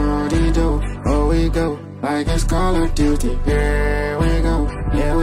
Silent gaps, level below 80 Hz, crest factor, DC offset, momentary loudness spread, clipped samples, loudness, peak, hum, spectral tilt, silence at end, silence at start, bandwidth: none; -20 dBFS; 14 dB; under 0.1%; 4 LU; under 0.1%; -19 LUFS; -4 dBFS; none; -6.5 dB/octave; 0 s; 0 s; 13.5 kHz